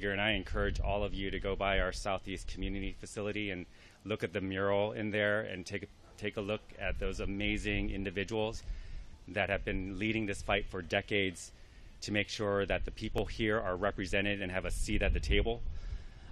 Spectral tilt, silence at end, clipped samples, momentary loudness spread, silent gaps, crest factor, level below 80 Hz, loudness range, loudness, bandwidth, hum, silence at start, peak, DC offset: -5 dB/octave; 0 s; under 0.1%; 11 LU; none; 22 dB; -42 dBFS; 3 LU; -35 LUFS; 13 kHz; none; 0 s; -14 dBFS; under 0.1%